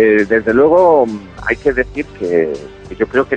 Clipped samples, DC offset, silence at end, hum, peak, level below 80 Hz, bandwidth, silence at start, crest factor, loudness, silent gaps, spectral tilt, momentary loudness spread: under 0.1%; under 0.1%; 0 s; none; 0 dBFS; -38 dBFS; 8.4 kHz; 0 s; 12 dB; -14 LUFS; none; -7 dB/octave; 13 LU